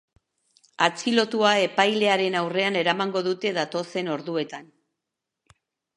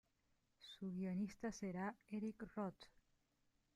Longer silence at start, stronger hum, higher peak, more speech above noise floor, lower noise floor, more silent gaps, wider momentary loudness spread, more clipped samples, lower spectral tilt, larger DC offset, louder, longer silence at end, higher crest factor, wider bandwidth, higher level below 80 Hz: first, 0.8 s vs 0.6 s; neither; first, -2 dBFS vs -36 dBFS; first, 61 dB vs 36 dB; about the same, -85 dBFS vs -83 dBFS; neither; second, 9 LU vs 16 LU; neither; second, -4 dB/octave vs -6.5 dB/octave; neither; first, -23 LUFS vs -48 LUFS; first, 1.3 s vs 0.85 s; first, 24 dB vs 14 dB; about the same, 11.5 kHz vs 12 kHz; about the same, -76 dBFS vs -76 dBFS